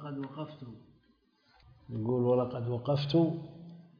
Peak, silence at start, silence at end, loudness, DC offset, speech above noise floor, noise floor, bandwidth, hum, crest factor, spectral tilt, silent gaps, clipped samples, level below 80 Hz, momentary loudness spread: -16 dBFS; 0 s; 0.15 s; -32 LUFS; under 0.1%; 38 dB; -69 dBFS; 5.2 kHz; none; 16 dB; -7.5 dB/octave; none; under 0.1%; -68 dBFS; 20 LU